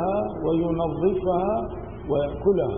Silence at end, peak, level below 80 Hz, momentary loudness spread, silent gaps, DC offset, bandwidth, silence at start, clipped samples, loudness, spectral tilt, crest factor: 0 s; -10 dBFS; -42 dBFS; 5 LU; none; 0.3%; 3.7 kHz; 0 s; under 0.1%; -25 LUFS; -12.5 dB/octave; 14 dB